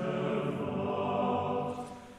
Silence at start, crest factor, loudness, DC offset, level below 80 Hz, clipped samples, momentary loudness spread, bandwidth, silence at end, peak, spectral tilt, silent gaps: 0 s; 16 dB; -33 LUFS; under 0.1%; -64 dBFS; under 0.1%; 5 LU; 12.5 kHz; 0 s; -18 dBFS; -7.5 dB/octave; none